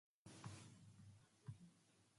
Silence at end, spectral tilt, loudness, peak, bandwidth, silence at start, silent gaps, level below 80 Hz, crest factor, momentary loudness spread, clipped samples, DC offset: 0 s; -5 dB/octave; -62 LUFS; -42 dBFS; 11.5 kHz; 0.25 s; none; -80 dBFS; 20 dB; 9 LU; under 0.1%; under 0.1%